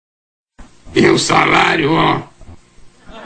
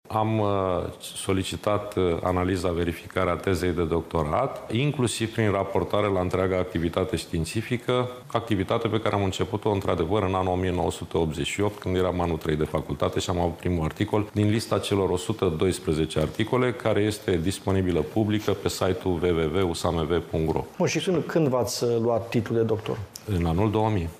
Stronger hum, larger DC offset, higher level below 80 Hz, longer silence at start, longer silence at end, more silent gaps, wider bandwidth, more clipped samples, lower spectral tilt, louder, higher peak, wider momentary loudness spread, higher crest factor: neither; neither; first, -42 dBFS vs -48 dBFS; first, 0.6 s vs 0.05 s; about the same, 0 s vs 0 s; neither; second, 9.6 kHz vs 15.5 kHz; neither; second, -4 dB/octave vs -6 dB/octave; first, -13 LUFS vs -26 LUFS; first, 0 dBFS vs -8 dBFS; first, 7 LU vs 3 LU; about the same, 16 dB vs 18 dB